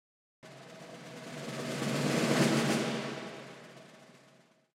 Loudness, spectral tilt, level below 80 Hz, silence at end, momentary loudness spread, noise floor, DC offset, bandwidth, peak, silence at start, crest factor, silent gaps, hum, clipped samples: -32 LUFS; -4.5 dB/octave; -74 dBFS; 0.7 s; 24 LU; -63 dBFS; under 0.1%; 16 kHz; -16 dBFS; 0.45 s; 20 dB; none; none; under 0.1%